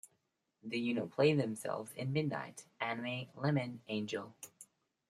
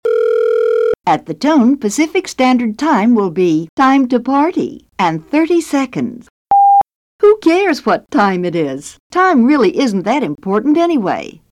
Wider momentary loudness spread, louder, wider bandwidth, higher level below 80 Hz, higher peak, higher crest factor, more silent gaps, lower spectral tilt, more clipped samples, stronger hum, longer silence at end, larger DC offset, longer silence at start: first, 17 LU vs 8 LU; second, -37 LUFS vs -13 LUFS; about the same, 14 kHz vs 13.5 kHz; second, -80 dBFS vs -54 dBFS; second, -18 dBFS vs -2 dBFS; first, 20 dB vs 10 dB; second, none vs 3.69-3.77 s, 6.30-6.45 s, 6.95-7.19 s, 9.00-9.10 s; about the same, -6 dB/octave vs -5.5 dB/octave; neither; neither; first, 0.45 s vs 0.2 s; neither; about the same, 0.05 s vs 0.05 s